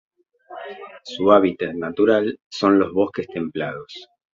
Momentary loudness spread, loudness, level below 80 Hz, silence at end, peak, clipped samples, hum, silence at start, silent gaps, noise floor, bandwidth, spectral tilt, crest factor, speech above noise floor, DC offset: 21 LU; -20 LUFS; -58 dBFS; 0.3 s; -2 dBFS; under 0.1%; none; 0.5 s; 2.46-2.51 s; -41 dBFS; 7.4 kHz; -6.5 dB/octave; 20 dB; 21 dB; under 0.1%